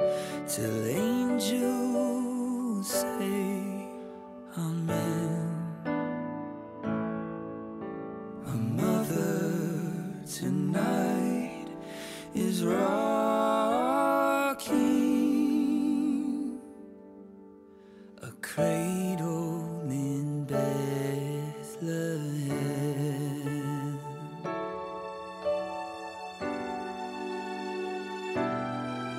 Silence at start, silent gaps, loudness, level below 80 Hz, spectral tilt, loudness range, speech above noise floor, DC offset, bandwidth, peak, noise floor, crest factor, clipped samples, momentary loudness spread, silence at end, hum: 0 s; none; -31 LUFS; -66 dBFS; -6 dB/octave; 8 LU; 23 dB; under 0.1%; 16 kHz; -14 dBFS; -52 dBFS; 16 dB; under 0.1%; 13 LU; 0 s; none